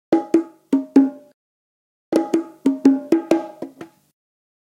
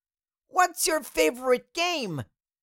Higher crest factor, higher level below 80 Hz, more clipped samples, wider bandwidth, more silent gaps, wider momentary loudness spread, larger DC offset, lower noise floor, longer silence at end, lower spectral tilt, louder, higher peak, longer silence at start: about the same, 20 dB vs 20 dB; second, -70 dBFS vs -60 dBFS; neither; second, 11 kHz vs 17 kHz; first, 1.34-2.12 s vs none; second, 8 LU vs 11 LU; neither; second, -40 dBFS vs -81 dBFS; first, 0.85 s vs 0.4 s; first, -6.5 dB/octave vs -2.5 dB/octave; first, -19 LUFS vs -26 LUFS; first, 0 dBFS vs -8 dBFS; second, 0.1 s vs 0.55 s